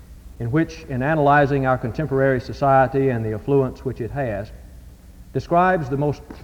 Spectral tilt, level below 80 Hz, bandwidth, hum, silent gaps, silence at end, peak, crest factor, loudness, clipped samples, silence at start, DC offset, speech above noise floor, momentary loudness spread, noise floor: -8.5 dB/octave; -42 dBFS; 15 kHz; none; none; 0 s; -4 dBFS; 16 dB; -20 LUFS; under 0.1%; 0 s; under 0.1%; 23 dB; 12 LU; -42 dBFS